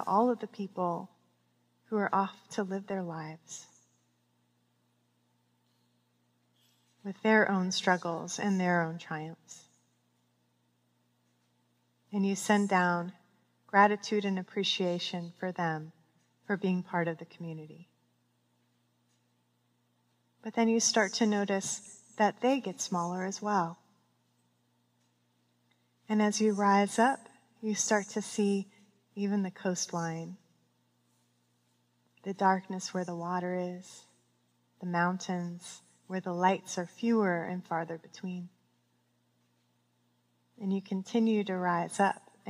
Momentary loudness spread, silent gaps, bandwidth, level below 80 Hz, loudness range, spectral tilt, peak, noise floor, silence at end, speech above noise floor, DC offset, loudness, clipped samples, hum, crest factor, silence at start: 17 LU; none; 15 kHz; -88 dBFS; 10 LU; -4.5 dB/octave; -10 dBFS; -74 dBFS; 0 s; 43 dB; under 0.1%; -31 LUFS; under 0.1%; 60 Hz at -60 dBFS; 24 dB; 0 s